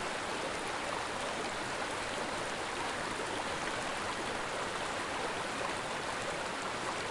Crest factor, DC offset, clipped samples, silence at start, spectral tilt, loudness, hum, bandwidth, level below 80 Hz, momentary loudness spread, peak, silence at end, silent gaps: 14 dB; under 0.1%; under 0.1%; 0 s; -2.5 dB/octave; -36 LUFS; none; 11.5 kHz; -60 dBFS; 1 LU; -22 dBFS; 0 s; none